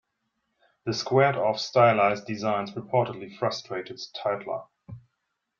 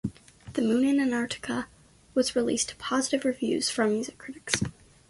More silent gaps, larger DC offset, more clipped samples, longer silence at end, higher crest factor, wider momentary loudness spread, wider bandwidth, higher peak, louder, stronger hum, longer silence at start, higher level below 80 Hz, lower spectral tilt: neither; neither; neither; first, 0.6 s vs 0.4 s; about the same, 20 dB vs 24 dB; first, 15 LU vs 11 LU; second, 7.4 kHz vs 12 kHz; about the same, -6 dBFS vs -4 dBFS; about the same, -26 LUFS vs -28 LUFS; neither; first, 0.85 s vs 0.05 s; second, -68 dBFS vs -56 dBFS; first, -5.5 dB/octave vs -3.5 dB/octave